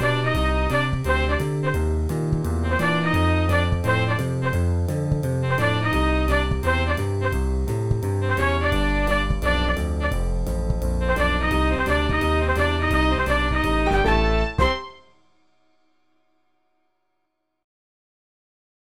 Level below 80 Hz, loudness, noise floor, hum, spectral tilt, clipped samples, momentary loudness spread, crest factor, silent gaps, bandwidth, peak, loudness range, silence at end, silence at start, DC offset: -28 dBFS; -22 LUFS; -76 dBFS; none; -6.5 dB/octave; under 0.1%; 4 LU; 14 dB; none; 16 kHz; -6 dBFS; 3 LU; 1.25 s; 0 s; 1%